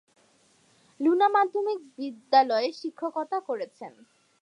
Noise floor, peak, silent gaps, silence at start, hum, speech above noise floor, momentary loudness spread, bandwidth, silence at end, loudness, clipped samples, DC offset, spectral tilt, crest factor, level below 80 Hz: -63 dBFS; -8 dBFS; none; 1 s; none; 37 dB; 16 LU; 10 kHz; 0.55 s; -26 LUFS; under 0.1%; under 0.1%; -4 dB/octave; 20 dB; -88 dBFS